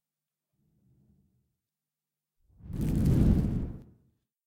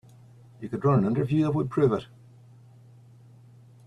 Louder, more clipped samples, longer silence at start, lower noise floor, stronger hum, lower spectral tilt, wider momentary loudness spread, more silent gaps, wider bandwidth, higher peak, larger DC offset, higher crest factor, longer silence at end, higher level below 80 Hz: second, -28 LUFS vs -25 LUFS; neither; first, 2.65 s vs 0.6 s; first, under -90 dBFS vs -52 dBFS; neither; about the same, -9 dB/octave vs -9.5 dB/octave; first, 17 LU vs 11 LU; neither; first, 16.5 kHz vs 10 kHz; about the same, -12 dBFS vs -10 dBFS; neither; about the same, 20 dB vs 18 dB; second, 0.65 s vs 1.8 s; first, -38 dBFS vs -60 dBFS